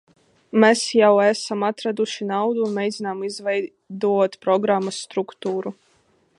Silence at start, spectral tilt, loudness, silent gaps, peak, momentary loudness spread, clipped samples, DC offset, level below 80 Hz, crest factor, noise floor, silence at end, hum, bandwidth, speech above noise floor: 0.55 s; -4.5 dB/octave; -21 LUFS; none; -2 dBFS; 11 LU; under 0.1%; under 0.1%; -76 dBFS; 20 dB; -61 dBFS; 0.65 s; none; 11.5 kHz; 41 dB